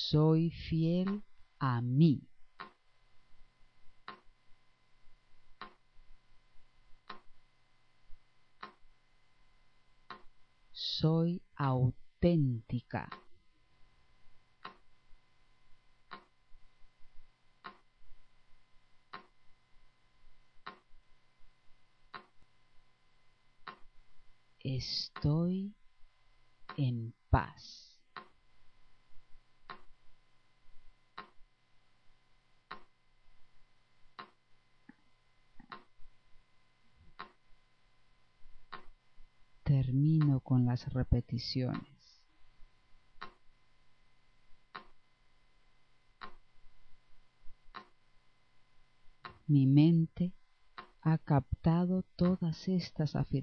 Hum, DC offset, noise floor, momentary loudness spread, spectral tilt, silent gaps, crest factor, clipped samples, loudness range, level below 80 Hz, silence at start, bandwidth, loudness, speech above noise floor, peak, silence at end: none; under 0.1%; -66 dBFS; 24 LU; -8.5 dB/octave; none; 24 dB; under 0.1%; 26 LU; -54 dBFS; 0 s; 6.4 kHz; -32 LUFS; 35 dB; -14 dBFS; 0 s